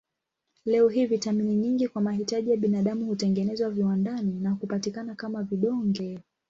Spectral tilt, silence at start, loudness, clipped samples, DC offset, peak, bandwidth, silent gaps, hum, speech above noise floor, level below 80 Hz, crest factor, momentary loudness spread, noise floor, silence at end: -7 dB/octave; 0.65 s; -27 LUFS; under 0.1%; under 0.1%; -12 dBFS; 7.8 kHz; none; none; 56 dB; -68 dBFS; 14 dB; 9 LU; -82 dBFS; 0.3 s